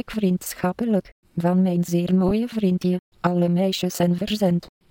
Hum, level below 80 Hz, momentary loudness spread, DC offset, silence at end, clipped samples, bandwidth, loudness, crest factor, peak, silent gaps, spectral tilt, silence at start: none; -50 dBFS; 5 LU; under 0.1%; 0.25 s; under 0.1%; 17 kHz; -22 LUFS; 16 dB; -6 dBFS; 1.12-1.23 s, 2.99-3.12 s; -6.5 dB/octave; 0.1 s